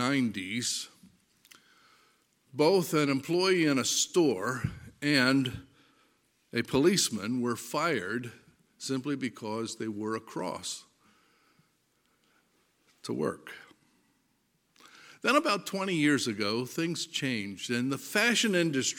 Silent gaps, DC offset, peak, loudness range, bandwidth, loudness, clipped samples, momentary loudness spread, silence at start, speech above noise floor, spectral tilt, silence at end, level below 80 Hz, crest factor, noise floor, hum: none; under 0.1%; -8 dBFS; 14 LU; 17 kHz; -29 LUFS; under 0.1%; 12 LU; 0 s; 44 dB; -3.5 dB/octave; 0 s; -66 dBFS; 22 dB; -73 dBFS; none